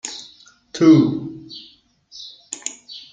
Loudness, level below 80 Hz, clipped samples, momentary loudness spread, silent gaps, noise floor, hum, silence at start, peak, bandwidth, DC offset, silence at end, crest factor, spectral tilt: -17 LUFS; -62 dBFS; under 0.1%; 24 LU; none; -51 dBFS; none; 0.05 s; -2 dBFS; 9.4 kHz; under 0.1%; 0.15 s; 18 dB; -5.5 dB/octave